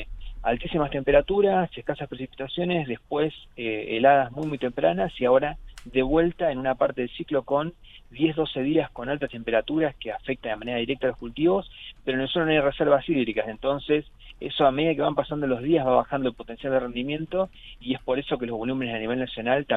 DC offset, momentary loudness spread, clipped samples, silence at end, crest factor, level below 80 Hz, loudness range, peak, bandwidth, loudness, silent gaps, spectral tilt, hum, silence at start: under 0.1%; 10 LU; under 0.1%; 0 s; 20 dB; -46 dBFS; 3 LU; -6 dBFS; 5.4 kHz; -25 LUFS; none; -8 dB/octave; none; 0 s